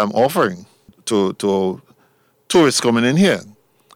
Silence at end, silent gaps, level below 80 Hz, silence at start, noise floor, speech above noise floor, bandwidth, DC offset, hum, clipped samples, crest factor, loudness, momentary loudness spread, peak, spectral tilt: 0.5 s; none; -60 dBFS; 0 s; -58 dBFS; 42 dB; 16.5 kHz; under 0.1%; none; under 0.1%; 16 dB; -17 LUFS; 11 LU; -2 dBFS; -4.5 dB/octave